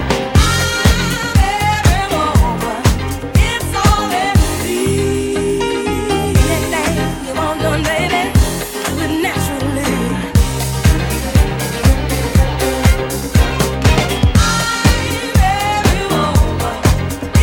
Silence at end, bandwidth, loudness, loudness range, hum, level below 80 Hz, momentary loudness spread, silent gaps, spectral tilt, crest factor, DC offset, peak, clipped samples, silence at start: 0 s; 17.5 kHz; -15 LUFS; 2 LU; none; -20 dBFS; 4 LU; none; -5 dB/octave; 14 dB; under 0.1%; 0 dBFS; under 0.1%; 0 s